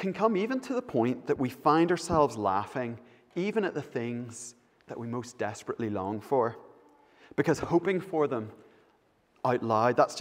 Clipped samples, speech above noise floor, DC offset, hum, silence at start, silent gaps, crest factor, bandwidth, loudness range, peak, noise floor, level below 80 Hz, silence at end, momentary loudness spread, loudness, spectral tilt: under 0.1%; 38 dB; under 0.1%; none; 0 s; none; 22 dB; 16 kHz; 6 LU; -8 dBFS; -67 dBFS; -62 dBFS; 0 s; 13 LU; -30 LUFS; -6 dB/octave